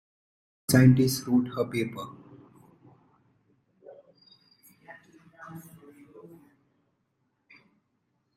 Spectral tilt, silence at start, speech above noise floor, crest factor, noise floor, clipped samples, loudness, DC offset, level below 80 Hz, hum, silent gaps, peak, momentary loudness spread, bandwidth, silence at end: -6 dB/octave; 0.7 s; 53 dB; 24 dB; -76 dBFS; under 0.1%; -24 LUFS; under 0.1%; -58 dBFS; none; none; -6 dBFS; 26 LU; 15 kHz; 2.75 s